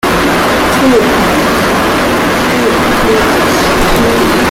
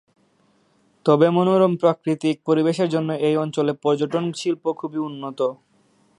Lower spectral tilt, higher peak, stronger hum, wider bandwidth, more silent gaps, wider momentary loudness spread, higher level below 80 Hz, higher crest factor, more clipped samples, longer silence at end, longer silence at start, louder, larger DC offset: second, -4 dB/octave vs -7 dB/octave; about the same, 0 dBFS vs -2 dBFS; neither; first, 16.5 kHz vs 11 kHz; neither; second, 2 LU vs 9 LU; first, -26 dBFS vs -70 dBFS; second, 8 dB vs 18 dB; neither; second, 0 s vs 0.65 s; second, 0.05 s vs 1.05 s; first, -9 LUFS vs -21 LUFS; neither